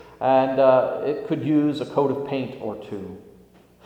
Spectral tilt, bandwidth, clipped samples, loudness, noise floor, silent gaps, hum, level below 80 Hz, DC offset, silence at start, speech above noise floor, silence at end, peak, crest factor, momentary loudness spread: -8 dB/octave; 8.6 kHz; under 0.1%; -22 LUFS; -52 dBFS; none; none; -62 dBFS; under 0.1%; 0.05 s; 30 dB; 0.65 s; -4 dBFS; 20 dB; 16 LU